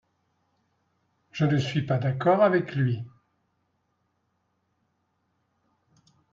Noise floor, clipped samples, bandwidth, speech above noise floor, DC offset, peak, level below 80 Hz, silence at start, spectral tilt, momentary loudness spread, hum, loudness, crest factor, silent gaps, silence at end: -74 dBFS; under 0.1%; 7.4 kHz; 51 dB; under 0.1%; -8 dBFS; -66 dBFS; 1.35 s; -7.5 dB/octave; 13 LU; none; -25 LUFS; 20 dB; none; 3.25 s